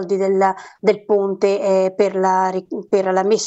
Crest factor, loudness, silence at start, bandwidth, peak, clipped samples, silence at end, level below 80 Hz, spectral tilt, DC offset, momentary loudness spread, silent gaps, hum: 14 dB; -18 LUFS; 0 s; 8.2 kHz; -2 dBFS; under 0.1%; 0 s; -68 dBFS; -5 dB/octave; under 0.1%; 4 LU; none; none